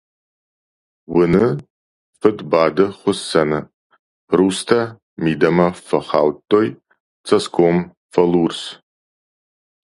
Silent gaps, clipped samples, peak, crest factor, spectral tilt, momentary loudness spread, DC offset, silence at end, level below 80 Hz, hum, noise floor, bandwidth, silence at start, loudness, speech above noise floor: 1.70-2.13 s, 3.74-3.90 s, 3.99-4.28 s, 5.02-5.16 s, 7.00-7.24 s, 7.97-8.09 s; under 0.1%; 0 dBFS; 18 dB; -6 dB/octave; 8 LU; under 0.1%; 1.15 s; -52 dBFS; none; under -90 dBFS; 11.5 kHz; 1.1 s; -18 LUFS; over 74 dB